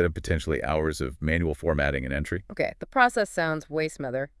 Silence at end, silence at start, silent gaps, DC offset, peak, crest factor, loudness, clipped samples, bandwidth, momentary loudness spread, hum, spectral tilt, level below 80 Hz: 0.15 s; 0 s; none; under 0.1%; -4 dBFS; 22 dB; -27 LUFS; under 0.1%; 12 kHz; 8 LU; none; -6 dB/octave; -40 dBFS